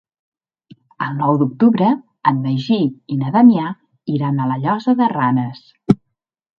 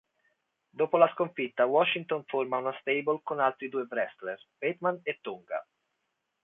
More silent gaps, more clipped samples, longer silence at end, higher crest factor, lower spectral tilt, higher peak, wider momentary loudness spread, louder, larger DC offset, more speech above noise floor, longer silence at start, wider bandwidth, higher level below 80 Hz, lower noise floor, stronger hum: neither; neither; second, 0.65 s vs 0.8 s; second, 18 dB vs 24 dB; about the same, -9 dB/octave vs -8 dB/octave; first, 0 dBFS vs -8 dBFS; about the same, 12 LU vs 13 LU; first, -17 LUFS vs -30 LUFS; neither; first, 59 dB vs 51 dB; first, 1 s vs 0.75 s; first, 5.6 kHz vs 3.9 kHz; first, -58 dBFS vs -82 dBFS; second, -75 dBFS vs -81 dBFS; neither